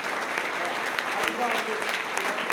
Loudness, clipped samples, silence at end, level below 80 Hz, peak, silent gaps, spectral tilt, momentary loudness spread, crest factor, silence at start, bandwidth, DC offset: -27 LUFS; under 0.1%; 0 s; -70 dBFS; -6 dBFS; none; -1.5 dB/octave; 2 LU; 22 dB; 0 s; 19 kHz; under 0.1%